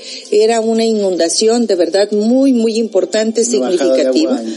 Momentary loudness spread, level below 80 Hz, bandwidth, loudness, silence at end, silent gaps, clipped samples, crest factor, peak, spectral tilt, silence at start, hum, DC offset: 3 LU; -78 dBFS; 11.5 kHz; -13 LUFS; 0 s; none; under 0.1%; 12 dB; 0 dBFS; -3.5 dB/octave; 0 s; none; under 0.1%